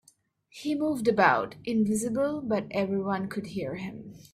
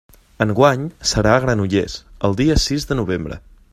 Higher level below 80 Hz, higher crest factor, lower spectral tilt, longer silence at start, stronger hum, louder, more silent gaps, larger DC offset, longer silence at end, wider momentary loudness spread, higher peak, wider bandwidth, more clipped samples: second, -64 dBFS vs -32 dBFS; about the same, 22 dB vs 18 dB; about the same, -5.5 dB/octave vs -5 dB/octave; first, 0.55 s vs 0.4 s; neither; second, -28 LUFS vs -18 LUFS; neither; neither; second, 0.1 s vs 0.35 s; first, 13 LU vs 10 LU; second, -6 dBFS vs 0 dBFS; about the same, 14.5 kHz vs 15 kHz; neither